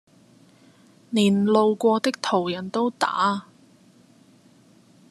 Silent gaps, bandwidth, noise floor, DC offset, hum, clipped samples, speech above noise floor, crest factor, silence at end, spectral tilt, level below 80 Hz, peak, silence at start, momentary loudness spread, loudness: none; 13 kHz; -55 dBFS; under 0.1%; none; under 0.1%; 34 dB; 18 dB; 1.7 s; -5.5 dB/octave; -68 dBFS; -6 dBFS; 1.1 s; 8 LU; -22 LUFS